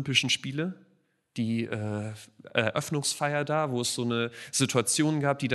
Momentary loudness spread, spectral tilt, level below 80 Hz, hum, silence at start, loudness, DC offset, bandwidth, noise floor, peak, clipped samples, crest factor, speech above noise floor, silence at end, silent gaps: 10 LU; -3.5 dB/octave; -70 dBFS; none; 0 s; -28 LUFS; under 0.1%; 12 kHz; -57 dBFS; -6 dBFS; under 0.1%; 22 dB; 29 dB; 0 s; none